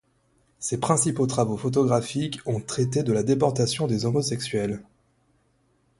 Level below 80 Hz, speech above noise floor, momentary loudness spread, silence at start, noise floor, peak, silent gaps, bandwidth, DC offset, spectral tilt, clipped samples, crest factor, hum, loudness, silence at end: -58 dBFS; 42 dB; 8 LU; 0.6 s; -66 dBFS; -6 dBFS; none; 11.5 kHz; under 0.1%; -5.5 dB/octave; under 0.1%; 20 dB; none; -25 LUFS; 1.15 s